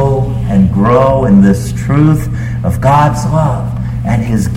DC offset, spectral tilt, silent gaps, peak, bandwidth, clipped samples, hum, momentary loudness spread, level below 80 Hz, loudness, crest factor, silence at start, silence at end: under 0.1%; -8 dB/octave; none; 0 dBFS; 15 kHz; under 0.1%; none; 8 LU; -24 dBFS; -11 LUFS; 10 dB; 0 s; 0 s